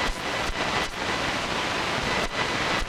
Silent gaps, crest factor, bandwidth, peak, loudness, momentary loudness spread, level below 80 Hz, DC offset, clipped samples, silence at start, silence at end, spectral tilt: none; 18 dB; 16.5 kHz; -10 dBFS; -26 LUFS; 2 LU; -38 dBFS; under 0.1%; under 0.1%; 0 s; 0 s; -3 dB/octave